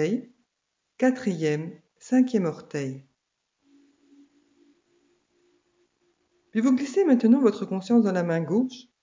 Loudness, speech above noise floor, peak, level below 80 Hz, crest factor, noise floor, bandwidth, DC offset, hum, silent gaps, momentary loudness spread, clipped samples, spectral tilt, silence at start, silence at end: -24 LUFS; 56 dB; -8 dBFS; -80 dBFS; 18 dB; -79 dBFS; 7.6 kHz; under 0.1%; none; none; 12 LU; under 0.1%; -7 dB/octave; 0 s; 0.2 s